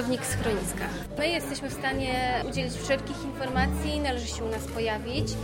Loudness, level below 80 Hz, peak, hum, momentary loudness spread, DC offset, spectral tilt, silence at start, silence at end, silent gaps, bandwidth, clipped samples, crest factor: -29 LUFS; -38 dBFS; -12 dBFS; none; 5 LU; under 0.1%; -4.5 dB/octave; 0 s; 0 s; none; 16.5 kHz; under 0.1%; 16 dB